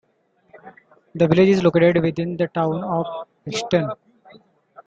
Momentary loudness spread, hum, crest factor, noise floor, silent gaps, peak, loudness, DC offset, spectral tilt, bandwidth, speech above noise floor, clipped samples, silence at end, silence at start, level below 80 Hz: 15 LU; none; 18 dB; -63 dBFS; none; -2 dBFS; -20 LUFS; under 0.1%; -7 dB/octave; 8 kHz; 44 dB; under 0.1%; 0.5 s; 0.55 s; -56 dBFS